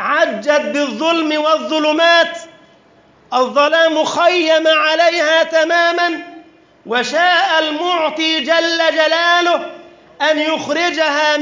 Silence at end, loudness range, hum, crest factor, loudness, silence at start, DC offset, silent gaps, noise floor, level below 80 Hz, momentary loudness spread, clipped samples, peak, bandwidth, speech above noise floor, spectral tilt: 0 s; 2 LU; none; 14 dB; -14 LUFS; 0 s; under 0.1%; none; -49 dBFS; -70 dBFS; 7 LU; under 0.1%; -2 dBFS; 7.6 kHz; 35 dB; -2 dB/octave